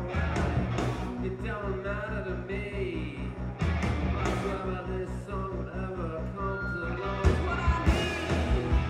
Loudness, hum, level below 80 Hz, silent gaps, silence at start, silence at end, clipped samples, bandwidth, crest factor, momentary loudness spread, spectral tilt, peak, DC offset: -31 LUFS; none; -34 dBFS; none; 0 s; 0 s; under 0.1%; 11.5 kHz; 20 dB; 8 LU; -6.5 dB/octave; -10 dBFS; under 0.1%